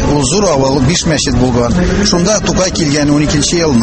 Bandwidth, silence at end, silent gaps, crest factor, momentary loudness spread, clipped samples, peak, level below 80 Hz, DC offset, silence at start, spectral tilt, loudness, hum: 8.8 kHz; 0 s; none; 10 dB; 2 LU; under 0.1%; 0 dBFS; -24 dBFS; under 0.1%; 0 s; -4.5 dB/octave; -11 LUFS; none